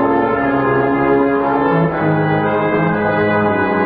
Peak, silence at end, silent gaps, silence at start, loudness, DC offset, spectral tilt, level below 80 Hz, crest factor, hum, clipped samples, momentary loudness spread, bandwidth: -4 dBFS; 0 s; none; 0 s; -15 LUFS; under 0.1%; -12.5 dB/octave; -42 dBFS; 10 dB; none; under 0.1%; 1 LU; 4.9 kHz